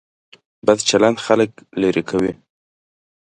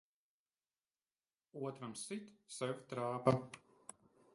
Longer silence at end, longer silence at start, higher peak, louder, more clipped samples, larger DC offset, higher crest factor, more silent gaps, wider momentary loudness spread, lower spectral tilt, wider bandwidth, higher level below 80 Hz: first, 0.95 s vs 0.75 s; second, 0.65 s vs 1.55 s; first, 0 dBFS vs -16 dBFS; first, -18 LUFS vs -41 LUFS; neither; neither; second, 20 dB vs 28 dB; neither; second, 7 LU vs 21 LU; second, -4 dB/octave vs -5.5 dB/octave; about the same, 11 kHz vs 11.5 kHz; first, -54 dBFS vs -76 dBFS